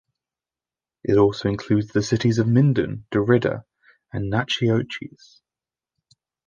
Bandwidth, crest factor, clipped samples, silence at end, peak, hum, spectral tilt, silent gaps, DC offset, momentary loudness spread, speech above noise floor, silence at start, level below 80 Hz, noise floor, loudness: 7.4 kHz; 20 dB; under 0.1%; 1.4 s; -4 dBFS; none; -7 dB/octave; none; under 0.1%; 14 LU; over 69 dB; 1.05 s; -50 dBFS; under -90 dBFS; -21 LUFS